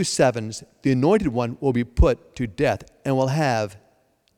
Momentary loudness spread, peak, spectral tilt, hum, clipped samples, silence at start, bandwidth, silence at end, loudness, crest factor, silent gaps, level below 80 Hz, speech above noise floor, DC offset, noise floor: 10 LU; -6 dBFS; -6 dB/octave; none; under 0.1%; 0 s; 15.5 kHz; 0.6 s; -22 LUFS; 16 dB; none; -32 dBFS; 42 dB; under 0.1%; -63 dBFS